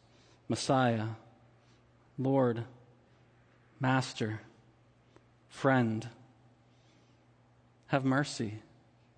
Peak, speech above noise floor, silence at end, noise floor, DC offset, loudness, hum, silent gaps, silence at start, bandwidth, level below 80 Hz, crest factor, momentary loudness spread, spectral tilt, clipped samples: -14 dBFS; 34 dB; 0.55 s; -65 dBFS; under 0.1%; -32 LUFS; none; none; 0.5 s; 9.8 kHz; -72 dBFS; 22 dB; 20 LU; -6 dB/octave; under 0.1%